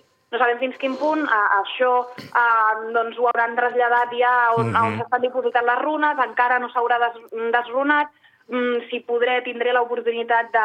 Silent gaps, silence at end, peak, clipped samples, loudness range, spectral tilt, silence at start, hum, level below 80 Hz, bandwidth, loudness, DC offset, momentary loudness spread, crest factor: none; 0 s; -4 dBFS; under 0.1%; 3 LU; -6.5 dB/octave; 0.3 s; none; -74 dBFS; 8.8 kHz; -20 LUFS; under 0.1%; 6 LU; 16 dB